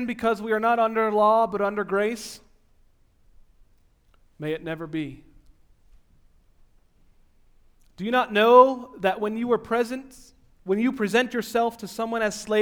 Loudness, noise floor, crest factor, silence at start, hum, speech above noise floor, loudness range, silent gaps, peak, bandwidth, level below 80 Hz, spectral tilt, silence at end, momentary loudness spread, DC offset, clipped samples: -23 LUFS; -60 dBFS; 22 dB; 0 s; none; 37 dB; 15 LU; none; -2 dBFS; 18 kHz; -58 dBFS; -5 dB/octave; 0 s; 15 LU; under 0.1%; under 0.1%